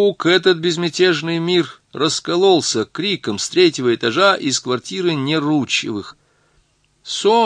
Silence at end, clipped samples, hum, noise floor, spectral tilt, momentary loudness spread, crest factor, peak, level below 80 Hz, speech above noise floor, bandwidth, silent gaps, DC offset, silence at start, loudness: 0 s; under 0.1%; none; -60 dBFS; -4 dB/octave; 7 LU; 16 dB; 0 dBFS; -64 dBFS; 43 dB; 10.5 kHz; none; under 0.1%; 0 s; -17 LUFS